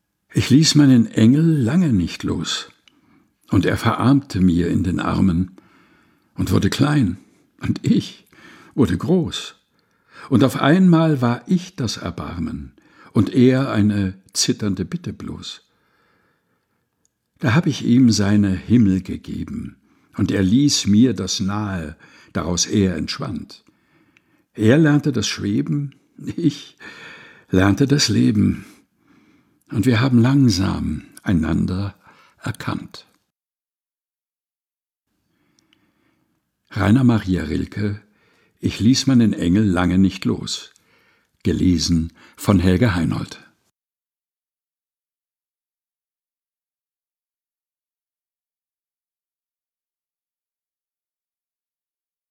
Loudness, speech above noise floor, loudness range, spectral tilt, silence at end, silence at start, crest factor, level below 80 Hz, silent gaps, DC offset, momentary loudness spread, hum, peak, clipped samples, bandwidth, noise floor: -18 LUFS; over 72 dB; 6 LU; -5.5 dB/octave; 8.95 s; 0.35 s; 20 dB; -44 dBFS; none; under 0.1%; 16 LU; none; -2 dBFS; under 0.1%; 16 kHz; under -90 dBFS